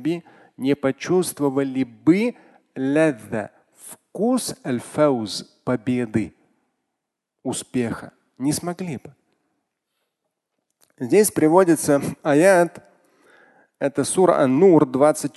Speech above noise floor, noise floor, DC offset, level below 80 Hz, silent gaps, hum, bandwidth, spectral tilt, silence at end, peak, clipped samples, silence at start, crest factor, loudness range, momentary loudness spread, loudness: 61 dB; -81 dBFS; under 0.1%; -60 dBFS; none; none; 12.5 kHz; -5.5 dB/octave; 0.1 s; -2 dBFS; under 0.1%; 0 s; 20 dB; 10 LU; 15 LU; -20 LUFS